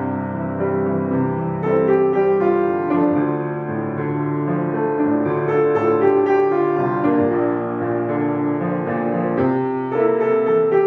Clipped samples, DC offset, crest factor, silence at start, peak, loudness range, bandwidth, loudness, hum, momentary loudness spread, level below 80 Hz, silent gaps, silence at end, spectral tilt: under 0.1%; under 0.1%; 14 dB; 0 s; -4 dBFS; 2 LU; 4.3 kHz; -19 LUFS; none; 6 LU; -60 dBFS; none; 0 s; -10.5 dB/octave